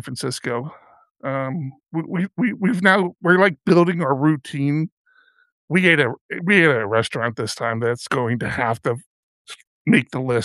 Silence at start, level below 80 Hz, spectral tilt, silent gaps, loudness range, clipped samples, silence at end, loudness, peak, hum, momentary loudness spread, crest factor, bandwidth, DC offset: 0.05 s; -60 dBFS; -6 dB/octave; 1.11-1.15 s, 4.92-5.05 s, 5.52-5.68 s, 6.21-6.29 s, 9.06-9.45 s, 9.67-9.85 s; 4 LU; under 0.1%; 0 s; -20 LUFS; -2 dBFS; none; 13 LU; 20 dB; 12.5 kHz; under 0.1%